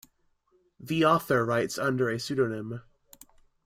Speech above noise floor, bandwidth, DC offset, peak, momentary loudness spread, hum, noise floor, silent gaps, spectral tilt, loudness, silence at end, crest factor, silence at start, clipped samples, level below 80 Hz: 42 dB; 16 kHz; under 0.1%; -10 dBFS; 13 LU; none; -69 dBFS; none; -5.5 dB/octave; -27 LUFS; 0.85 s; 20 dB; 0.8 s; under 0.1%; -64 dBFS